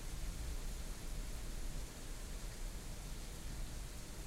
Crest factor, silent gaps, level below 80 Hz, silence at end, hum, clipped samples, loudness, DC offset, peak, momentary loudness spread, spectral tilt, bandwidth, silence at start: 12 dB; none; -46 dBFS; 0 s; none; under 0.1%; -49 LUFS; under 0.1%; -32 dBFS; 3 LU; -3.5 dB/octave; 16 kHz; 0 s